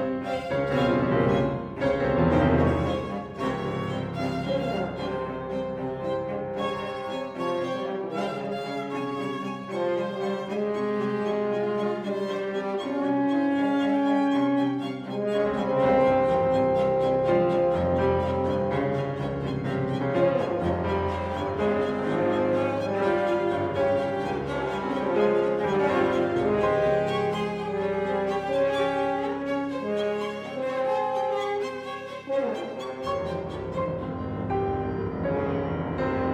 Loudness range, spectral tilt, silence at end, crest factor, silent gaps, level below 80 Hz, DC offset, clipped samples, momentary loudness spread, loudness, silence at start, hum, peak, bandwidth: 6 LU; -7.5 dB/octave; 0 s; 16 dB; none; -48 dBFS; under 0.1%; under 0.1%; 8 LU; -26 LUFS; 0 s; none; -10 dBFS; 10 kHz